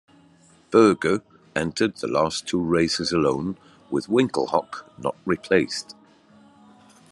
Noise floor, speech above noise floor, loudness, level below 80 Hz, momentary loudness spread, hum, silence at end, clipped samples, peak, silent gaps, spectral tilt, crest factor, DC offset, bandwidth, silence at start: -55 dBFS; 33 dB; -23 LUFS; -60 dBFS; 13 LU; none; 1.2 s; under 0.1%; -4 dBFS; none; -5 dB/octave; 20 dB; under 0.1%; 11.5 kHz; 0.7 s